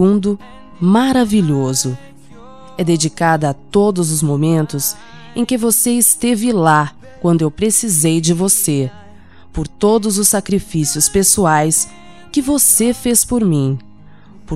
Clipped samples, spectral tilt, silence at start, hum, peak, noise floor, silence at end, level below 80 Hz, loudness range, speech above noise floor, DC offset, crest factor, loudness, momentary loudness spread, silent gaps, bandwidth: under 0.1%; -4.5 dB/octave; 0 s; none; 0 dBFS; -42 dBFS; 0 s; -40 dBFS; 3 LU; 28 dB; 1%; 16 dB; -14 LUFS; 11 LU; none; 16.5 kHz